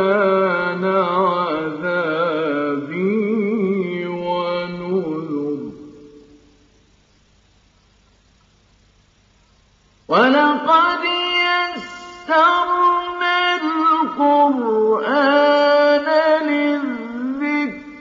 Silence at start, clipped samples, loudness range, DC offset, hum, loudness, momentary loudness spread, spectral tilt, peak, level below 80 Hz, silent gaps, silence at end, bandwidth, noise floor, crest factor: 0 s; under 0.1%; 11 LU; under 0.1%; none; -17 LUFS; 10 LU; -6 dB/octave; -2 dBFS; -60 dBFS; none; 0 s; 7.6 kHz; -56 dBFS; 16 dB